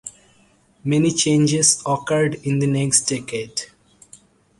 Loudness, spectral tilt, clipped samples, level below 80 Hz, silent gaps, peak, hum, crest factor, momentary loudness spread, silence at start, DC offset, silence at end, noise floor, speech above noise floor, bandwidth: -19 LUFS; -4 dB/octave; under 0.1%; -56 dBFS; none; -2 dBFS; none; 20 dB; 14 LU; 0.05 s; under 0.1%; 0.95 s; -56 dBFS; 38 dB; 11.5 kHz